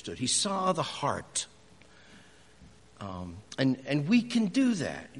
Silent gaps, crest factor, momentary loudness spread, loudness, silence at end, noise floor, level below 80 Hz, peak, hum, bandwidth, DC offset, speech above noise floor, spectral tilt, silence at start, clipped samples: none; 20 dB; 15 LU; -29 LUFS; 0 s; -57 dBFS; -64 dBFS; -12 dBFS; none; 11.5 kHz; under 0.1%; 28 dB; -4 dB/octave; 0.05 s; under 0.1%